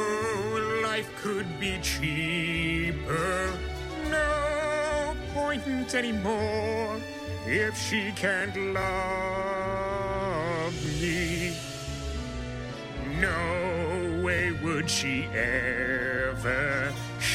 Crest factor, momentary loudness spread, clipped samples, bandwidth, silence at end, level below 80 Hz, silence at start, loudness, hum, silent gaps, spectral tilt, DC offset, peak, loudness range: 18 dB; 8 LU; under 0.1%; 16 kHz; 0 s; -42 dBFS; 0 s; -29 LUFS; none; none; -4.5 dB/octave; under 0.1%; -10 dBFS; 3 LU